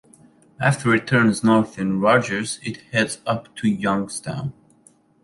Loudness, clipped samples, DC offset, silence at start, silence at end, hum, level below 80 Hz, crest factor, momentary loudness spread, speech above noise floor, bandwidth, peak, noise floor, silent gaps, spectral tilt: -21 LUFS; under 0.1%; under 0.1%; 0.6 s; 0.7 s; none; -56 dBFS; 18 dB; 11 LU; 35 dB; 11.5 kHz; -4 dBFS; -56 dBFS; none; -5.5 dB/octave